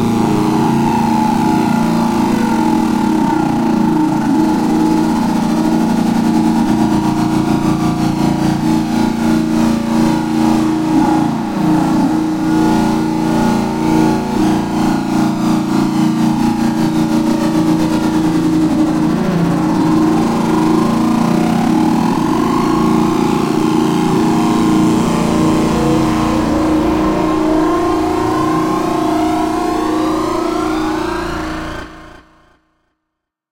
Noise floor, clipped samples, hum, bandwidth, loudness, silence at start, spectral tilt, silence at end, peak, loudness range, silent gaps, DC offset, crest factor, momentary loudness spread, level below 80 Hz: -76 dBFS; under 0.1%; none; 16.5 kHz; -14 LUFS; 0 s; -6.5 dB/octave; 1.4 s; 0 dBFS; 2 LU; none; under 0.1%; 12 dB; 2 LU; -36 dBFS